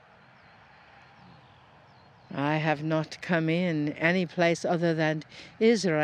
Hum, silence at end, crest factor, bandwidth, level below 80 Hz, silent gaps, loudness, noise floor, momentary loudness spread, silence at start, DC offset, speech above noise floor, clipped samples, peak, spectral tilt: none; 0 s; 20 dB; 9.8 kHz; -70 dBFS; none; -27 LUFS; -56 dBFS; 7 LU; 2.3 s; under 0.1%; 29 dB; under 0.1%; -8 dBFS; -6 dB/octave